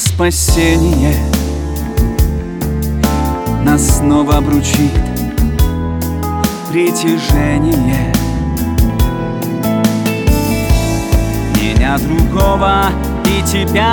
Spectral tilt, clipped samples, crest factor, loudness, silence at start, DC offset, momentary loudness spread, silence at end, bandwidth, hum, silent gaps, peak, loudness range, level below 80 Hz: -5.5 dB/octave; under 0.1%; 12 dB; -14 LUFS; 0 s; under 0.1%; 6 LU; 0 s; over 20 kHz; none; none; 0 dBFS; 1 LU; -18 dBFS